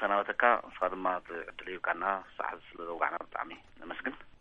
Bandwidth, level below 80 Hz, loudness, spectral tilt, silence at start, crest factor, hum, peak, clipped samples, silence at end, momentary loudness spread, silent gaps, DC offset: 7.4 kHz; -64 dBFS; -33 LUFS; -6 dB/octave; 0 s; 26 dB; none; -8 dBFS; under 0.1%; 0.1 s; 15 LU; none; under 0.1%